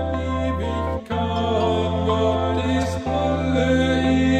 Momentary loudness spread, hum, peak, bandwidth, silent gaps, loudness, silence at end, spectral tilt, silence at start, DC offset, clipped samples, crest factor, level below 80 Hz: 6 LU; none; -8 dBFS; 9.2 kHz; none; -21 LUFS; 0 s; -6.5 dB/octave; 0 s; under 0.1%; under 0.1%; 12 dB; -34 dBFS